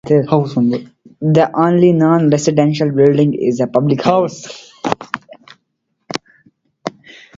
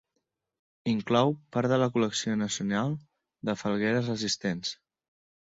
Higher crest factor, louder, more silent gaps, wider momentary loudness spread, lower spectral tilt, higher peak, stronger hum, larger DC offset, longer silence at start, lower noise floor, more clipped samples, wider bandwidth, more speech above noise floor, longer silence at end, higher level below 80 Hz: second, 14 dB vs 20 dB; first, -14 LUFS vs -29 LUFS; neither; first, 16 LU vs 11 LU; first, -7 dB/octave vs -5 dB/octave; first, 0 dBFS vs -10 dBFS; neither; neither; second, 0.05 s vs 0.85 s; second, -70 dBFS vs -81 dBFS; neither; about the same, 7.8 kHz vs 7.8 kHz; about the same, 56 dB vs 53 dB; second, 0.5 s vs 0.65 s; first, -54 dBFS vs -66 dBFS